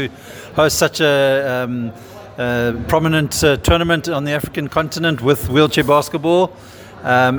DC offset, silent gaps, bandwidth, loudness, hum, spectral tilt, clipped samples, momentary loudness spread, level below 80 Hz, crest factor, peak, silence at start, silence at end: under 0.1%; none; over 20 kHz; -16 LUFS; none; -4.5 dB/octave; under 0.1%; 11 LU; -36 dBFS; 16 dB; 0 dBFS; 0 s; 0 s